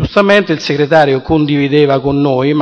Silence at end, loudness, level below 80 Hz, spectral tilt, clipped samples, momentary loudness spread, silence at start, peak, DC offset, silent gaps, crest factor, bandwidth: 0 s; -11 LUFS; -36 dBFS; -7 dB/octave; 0.1%; 3 LU; 0 s; 0 dBFS; under 0.1%; none; 10 dB; 8.6 kHz